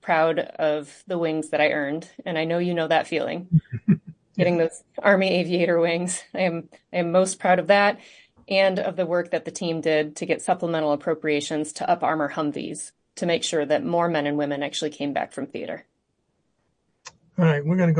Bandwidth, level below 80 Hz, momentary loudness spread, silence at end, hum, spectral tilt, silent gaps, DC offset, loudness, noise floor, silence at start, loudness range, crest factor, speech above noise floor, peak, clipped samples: 10.5 kHz; -64 dBFS; 10 LU; 0 s; none; -5.5 dB/octave; none; under 0.1%; -23 LUFS; -72 dBFS; 0.05 s; 4 LU; 20 dB; 49 dB; -4 dBFS; under 0.1%